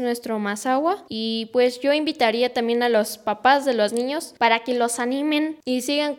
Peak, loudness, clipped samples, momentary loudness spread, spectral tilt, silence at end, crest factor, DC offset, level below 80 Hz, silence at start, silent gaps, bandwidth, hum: -4 dBFS; -22 LUFS; under 0.1%; 7 LU; -3 dB/octave; 0 s; 18 dB; under 0.1%; -70 dBFS; 0 s; none; 17.5 kHz; none